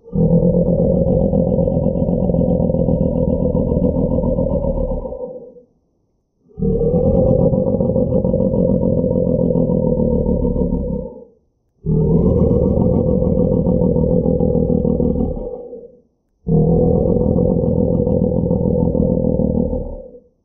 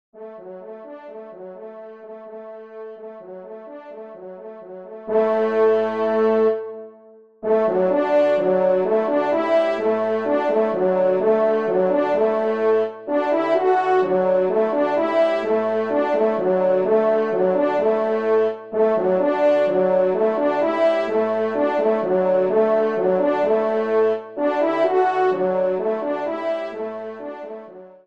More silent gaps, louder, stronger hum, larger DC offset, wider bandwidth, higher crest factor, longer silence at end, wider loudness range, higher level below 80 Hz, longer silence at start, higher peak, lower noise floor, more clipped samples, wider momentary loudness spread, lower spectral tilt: neither; about the same, -17 LUFS vs -19 LUFS; neither; second, under 0.1% vs 0.2%; second, 1.3 kHz vs 7.2 kHz; about the same, 14 dB vs 14 dB; about the same, 0.25 s vs 0.2 s; second, 3 LU vs 8 LU; first, -26 dBFS vs -72 dBFS; about the same, 0.05 s vs 0.15 s; first, -2 dBFS vs -6 dBFS; first, -64 dBFS vs -48 dBFS; neither; second, 9 LU vs 19 LU; first, -15.5 dB/octave vs -7.5 dB/octave